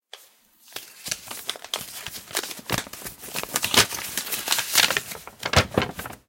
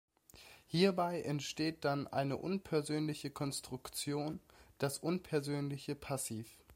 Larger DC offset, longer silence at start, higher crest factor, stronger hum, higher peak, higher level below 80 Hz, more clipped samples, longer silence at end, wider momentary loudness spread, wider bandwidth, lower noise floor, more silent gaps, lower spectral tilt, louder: neither; second, 0.15 s vs 0.35 s; about the same, 26 dB vs 22 dB; neither; first, -2 dBFS vs -16 dBFS; first, -48 dBFS vs -70 dBFS; neither; about the same, 0.1 s vs 0 s; first, 17 LU vs 11 LU; about the same, 17 kHz vs 16 kHz; second, -55 dBFS vs -60 dBFS; neither; second, -1.5 dB/octave vs -5 dB/octave; first, -24 LUFS vs -38 LUFS